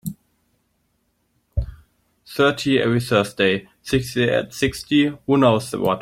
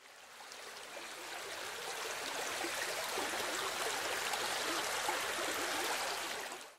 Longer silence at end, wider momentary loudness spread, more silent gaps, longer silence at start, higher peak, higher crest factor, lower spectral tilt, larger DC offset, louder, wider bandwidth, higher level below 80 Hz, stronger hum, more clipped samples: about the same, 0 s vs 0 s; about the same, 12 LU vs 11 LU; neither; about the same, 0.05 s vs 0 s; first, -2 dBFS vs -22 dBFS; about the same, 18 dB vs 18 dB; first, -5.5 dB/octave vs 0 dB/octave; neither; first, -20 LUFS vs -37 LUFS; about the same, 16.5 kHz vs 16 kHz; first, -40 dBFS vs -76 dBFS; neither; neither